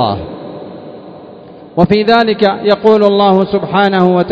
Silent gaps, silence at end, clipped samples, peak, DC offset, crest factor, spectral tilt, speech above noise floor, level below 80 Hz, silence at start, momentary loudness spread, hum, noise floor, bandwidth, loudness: none; 0 s; 0.7%; 0 dBFS; under 0.1%; 12 dB; -8 dB/octave; 24 dB; -42 dBFS; 0 s; 20 LU; none; -34 dBFS; 8 kHz; -11 LUFS